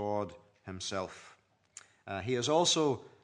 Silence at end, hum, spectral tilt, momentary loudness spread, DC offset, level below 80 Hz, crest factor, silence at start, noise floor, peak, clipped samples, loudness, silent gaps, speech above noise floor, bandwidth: 0.15 s; none; -3.5 dB/octave; 26 LU; under 0.1%; -76 dBFS; 20 dB; 0 s; -58 dBFS; -14 dBFS; under 0.1%; -32 LUFS; none; 25 dB; 11 kHz